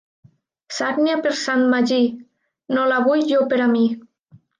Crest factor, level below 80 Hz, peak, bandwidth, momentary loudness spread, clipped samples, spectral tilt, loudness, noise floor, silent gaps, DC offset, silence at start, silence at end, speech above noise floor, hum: 12 dB; -74 dBFS; -8 dBFS; 9.4 kHz; 8 LU; under 0.1%; -4 dB/octave; -19 LUFS; -53 dBFS; none; under 0.1%; 0.7 s; 0.6 s; 35 dB; none